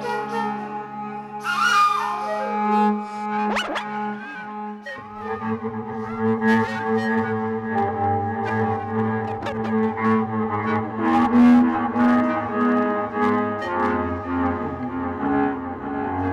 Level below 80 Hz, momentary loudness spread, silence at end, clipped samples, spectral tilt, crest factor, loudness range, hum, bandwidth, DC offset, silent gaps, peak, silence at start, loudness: -54 dBFS; 12 LU; 0 s; under 0.1%; -6.5 dB/octave; 14 dB; 6 LU; none; 12 kHz; under 0.1%; none; -8 dBFS; 0 s; -22 LUFS